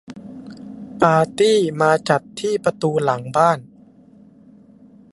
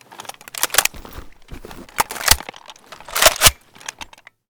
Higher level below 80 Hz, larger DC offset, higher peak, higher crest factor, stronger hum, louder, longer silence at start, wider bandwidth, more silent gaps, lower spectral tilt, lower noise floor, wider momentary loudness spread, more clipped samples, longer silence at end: second, -60 dBFS vs -36 dBFS; neither; about the same, 0 dBFS vs 0 dBFS; about the same, 20 dB vs 22 dB; neither; about the same, -18 LUFS vs -16 LUFS; about the same, 0.1 s vs 0.2 s; second, 11.5 kHz vs over 20 kHz; neither; first, -5.5 dB/octave vs -0.5 dB/octave; first, -48 dBFS vs -41 dBFS; second, 21 LU vs 25 LU; second, under 0.1% vs 0.1%; first, 1.5 s vs 0.95 s